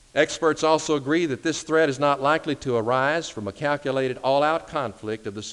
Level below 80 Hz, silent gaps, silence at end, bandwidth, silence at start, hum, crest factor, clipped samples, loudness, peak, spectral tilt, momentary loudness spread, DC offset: -58 dBFS; none; 0 s; 11.5 kHz; 0.15 s; none; 18 dB; under 0.1%; -23 LUFS; -6 dBFS; -4.5 dB/octave; 9 LU; under 0.1%